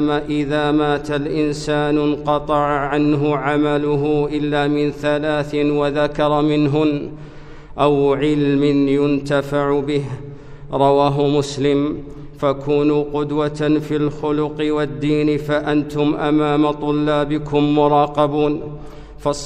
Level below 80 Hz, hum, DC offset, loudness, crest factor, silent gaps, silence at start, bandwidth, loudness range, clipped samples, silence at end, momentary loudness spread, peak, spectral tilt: -40 dBFS; none; under 0.1%; -18 LUFS; 16 dB; none; 0 s; 9.4 kHz; 2 LU; under 0.1%; 0 s; 6 LU; -2 dBFS; -7 dB/octave